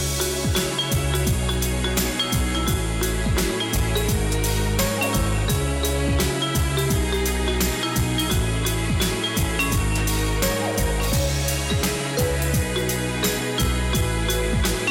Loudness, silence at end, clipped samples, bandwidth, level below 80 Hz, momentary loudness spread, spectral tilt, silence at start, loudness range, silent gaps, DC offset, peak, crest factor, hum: -22 LUFS; 0 s; under 0.1%; 17 kHz; -28 dBFS; 1 LU; -4 dB/octave; 0 s; 0 LU; none; under 0.1%; -12 dBFS; 10 dB; none